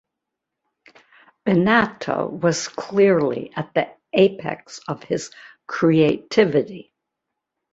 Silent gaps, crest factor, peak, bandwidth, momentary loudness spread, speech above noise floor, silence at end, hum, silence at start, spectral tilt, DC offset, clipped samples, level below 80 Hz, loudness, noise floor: none; 20 dB; -2 dBFS; 8 kHz; 15 LU; 63 dB; 0.9 s; none; 1.45 s; -5.5 dB/octave; under 0.1%; under 0.1%; -58 dBFS; -20 LUFS; -82 dBFS